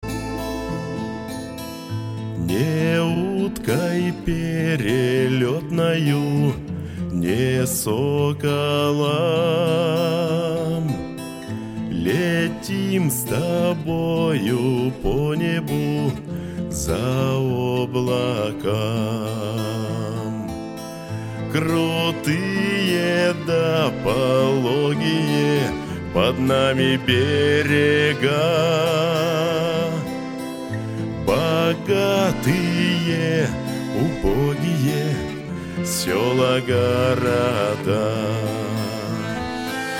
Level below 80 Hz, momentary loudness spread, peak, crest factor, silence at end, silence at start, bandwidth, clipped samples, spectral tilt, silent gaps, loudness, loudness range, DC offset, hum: -42 dBFS; 10 LU; -4 dBFS; 18 dB; 0 s; 0 s; 17 kHz; under 0.1%; -5.5 dB/octave; none; -21 LUFS; 4 LU; under 0.1%; none